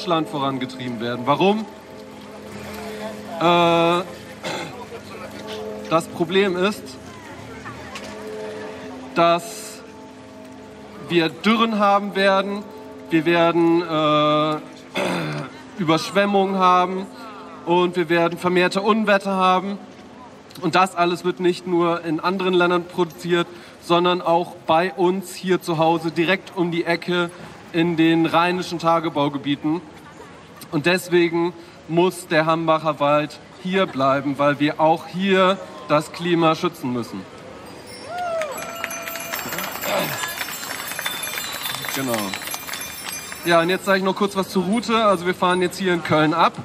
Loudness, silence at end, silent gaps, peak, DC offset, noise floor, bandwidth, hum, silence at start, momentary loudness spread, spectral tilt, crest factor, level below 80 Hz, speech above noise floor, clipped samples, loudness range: -20 LUFS; 0 s; none; -4 dBFS; under 0.1%; -42 dBFS; 15.5 kHz; none; 0 s; 18 LU; -5 dB/octave; 18 dB; -62 dBFS; 22 dB; under 0.1%; 6 LU